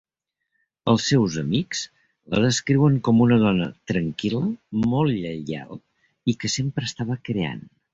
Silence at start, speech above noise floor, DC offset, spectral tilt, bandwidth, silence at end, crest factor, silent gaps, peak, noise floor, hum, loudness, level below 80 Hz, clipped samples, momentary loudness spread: 0.85 s; 59 dB; under 0.1%; -5.5 dB/octave; 8 kHz; 0.35 s; 18 dB; none; -6 dBFS; -80 dBFS; none; -23 LUFS; -52 dBFS; under 0.1%; 12 LU